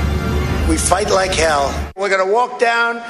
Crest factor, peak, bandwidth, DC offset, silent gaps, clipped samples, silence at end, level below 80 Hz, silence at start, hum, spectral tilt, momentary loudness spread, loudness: 16 dB; 0 dBFS; 13 kHz; under 0.1%; none; under 0.1%; 0 s; -24 dBFS; 0 s; none; -4 dB/octave; 5 LU; -16 LUFS